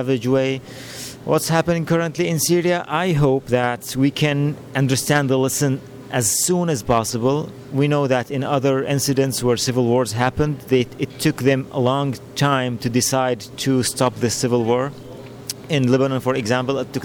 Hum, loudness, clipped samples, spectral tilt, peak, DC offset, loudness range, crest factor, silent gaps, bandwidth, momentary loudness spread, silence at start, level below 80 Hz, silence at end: none; -19 LUFS; under 0.1%; -5 dB/octave; -6 dBFS; under 0.1%; 1 LU; 14 dB; none; 19 kHz; 7 LU; 0 s; -50 dBFS; 0 s